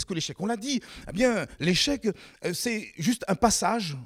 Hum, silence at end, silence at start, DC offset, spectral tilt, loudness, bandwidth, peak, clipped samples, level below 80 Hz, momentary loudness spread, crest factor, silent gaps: none; 0 s; 0 s; under 0.1%; -3.5 dB/octave; -27 LUFS; 17 kHz; -8 dBFS; under 0.1%; -50 dBFS; 9 LU; 20 dB; none